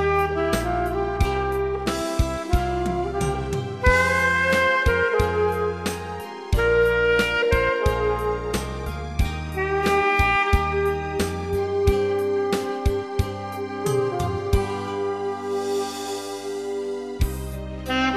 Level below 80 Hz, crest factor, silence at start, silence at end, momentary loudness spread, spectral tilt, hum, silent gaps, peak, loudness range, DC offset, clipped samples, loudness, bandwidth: -32 dBFS; 18 dB; 0 s; 0 s; 10 LU; -5.5 dB/octave; none; none; -6 dBFS; 5 LU; under 0.1%; under 0.1%; -23 LUFS; 14 kHz